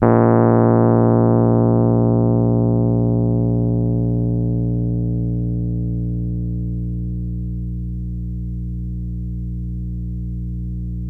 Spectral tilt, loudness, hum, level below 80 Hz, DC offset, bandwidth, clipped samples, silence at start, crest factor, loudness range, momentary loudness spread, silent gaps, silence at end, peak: -14 dB/octave; -19 LUFS; 60 Hz at -70 dBFS; -30 dBFS; under 0.1%; 2.3 kHz; under 0.1%; 0 s; 16 dB; 11 LU; 13 LU; none; 0 s; 0 dBFS